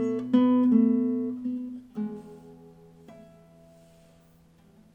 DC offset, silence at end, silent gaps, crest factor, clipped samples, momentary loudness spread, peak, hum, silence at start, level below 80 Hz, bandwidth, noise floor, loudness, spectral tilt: under 0.1%; 1.75 s; none; 18 dB; under 0.1%; 17 LU; -10 dBFS; none; 0 s; -68 dBFS; 3.5 kHz; -58 dBFS; -25 LUFS; -8.5 dB/octave